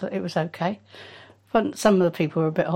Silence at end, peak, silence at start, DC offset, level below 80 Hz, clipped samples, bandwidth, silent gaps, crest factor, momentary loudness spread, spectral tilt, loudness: 0 s; -6 dBFS; 0 s; under 0.1%; -60 dBFS; under 0.1%; 16 kHz; none; 18 dB; 22 LU; -6.5 dB/octave; -23 LUFS